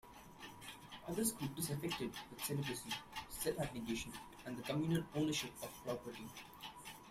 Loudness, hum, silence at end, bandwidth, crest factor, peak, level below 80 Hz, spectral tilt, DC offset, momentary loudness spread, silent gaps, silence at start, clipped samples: -43 LUFS; none; 0 s; 16 kHz; 20 dB; -24 dBFS; -66 dBFS; -4.5 dB/octave; under 0.1%; 14 LU; none; 0.05 s; under 0.1%